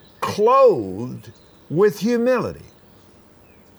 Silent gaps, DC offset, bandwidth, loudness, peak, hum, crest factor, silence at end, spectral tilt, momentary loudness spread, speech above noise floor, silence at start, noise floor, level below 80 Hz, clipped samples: none; under 0.1%; over 20 kHz; -18 LUFS; -4 dBFS; none; 16 dB; 1.15 s; -6.5 dB/octave; 18 LU; 32 dB; 0.2 s; -50 dBFS; -58 dBFS; under 0.1%